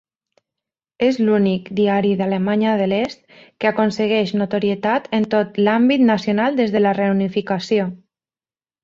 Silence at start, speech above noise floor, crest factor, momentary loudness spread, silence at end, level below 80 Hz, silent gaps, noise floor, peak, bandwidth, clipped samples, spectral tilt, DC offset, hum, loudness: 1 s; over 72 dB; 16 dB; 5 LU; 0.85 s; -60 dBFS; none; under -90 dBFS; -4 dBFS; 7.4 kHz; under 0.1%; -7 dB/octave; under 0.1%; none; -18 LUFS